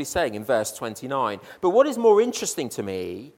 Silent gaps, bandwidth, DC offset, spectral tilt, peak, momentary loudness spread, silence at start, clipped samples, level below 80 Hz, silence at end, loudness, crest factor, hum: none; 17 kHz; under 0.1%; -4 dB/octave; -6 dBFS; 12 LU; 0 s; under 0.1%; -56 dBFS; 0.05 s; -23 LUFS; 18 dB; none